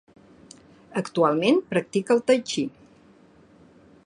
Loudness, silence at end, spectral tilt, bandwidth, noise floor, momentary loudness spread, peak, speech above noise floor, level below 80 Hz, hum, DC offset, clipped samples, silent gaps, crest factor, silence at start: -23 LUFS; 1.35 s; -5 dB/octave; 11 kHz; -54 dBFS; 11 LU; -6 dBFS; 32 dB; -68 dBFS; none; under 0.1%; under 0.1%; none; 20 dB; 0.95 s